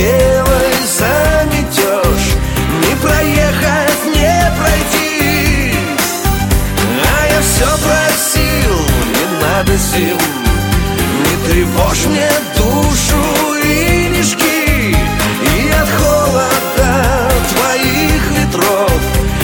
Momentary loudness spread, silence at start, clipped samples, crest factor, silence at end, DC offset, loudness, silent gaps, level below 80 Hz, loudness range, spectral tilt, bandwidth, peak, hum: 3 LU; 0 s; under 0.1%; 12 dB; 0 s; under 0.1%; -12 LUFS; none; -20 dBFS; 1 LU; -4 dB/octave; 17.5 kHz; 0 dBFS; none